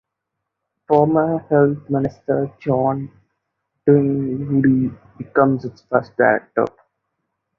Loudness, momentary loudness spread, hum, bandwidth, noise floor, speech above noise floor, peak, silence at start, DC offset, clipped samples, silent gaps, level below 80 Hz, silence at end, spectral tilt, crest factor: -19 LUFS; 8 LU; none; 5.8 kHz; -79 dBFS; 62 dB; 0 dBFS; 0.9 s; under 0.1%; under 0.1%; none; -56 dBFS; 0.9 s; -11 dB/octave; 18 dB